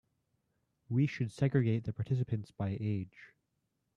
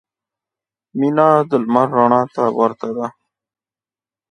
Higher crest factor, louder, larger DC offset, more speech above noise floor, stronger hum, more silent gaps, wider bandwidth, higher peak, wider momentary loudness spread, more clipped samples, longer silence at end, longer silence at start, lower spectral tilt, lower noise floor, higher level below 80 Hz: about the same, 20 dB vs 18 dB; second, -34 LUFS vs -16 LUFS; neither; second, 49 dB vs over 75 dB; neither; neither; about the same, 10 kHz vs 9.8 kHz; second, -16 dBFS vs 0 dBFS; second, 7 LU vs 12 LU; neither; second, 0.7 s vs 1.2 s; about the same, 0.9 s vs 0.95 s; about the same, -8.5 dB/octave vs -8.5 dB/octave; second, -82 dBFS vs under -90 dBFS; about the same, -66 dBFS vs -66 dBFS